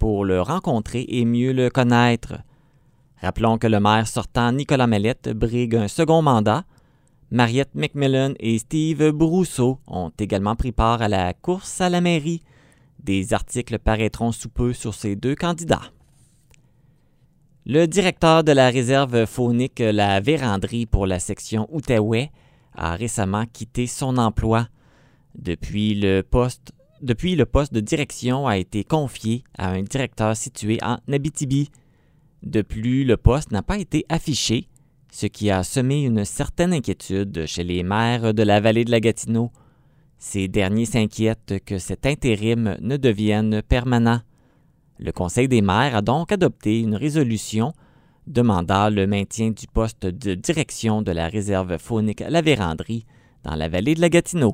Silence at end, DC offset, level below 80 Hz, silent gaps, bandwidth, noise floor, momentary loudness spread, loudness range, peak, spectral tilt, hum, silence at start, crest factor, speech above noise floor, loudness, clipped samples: 0 s; under 0.1%; -36 dBFS; none; 16 kHz; -57 dBFS; 9 LU; 5 LU; 0 dBFS; -6 dB/octave; none; 0 s; 20 dB; 37 dB; -21 LUFS; under 0.1%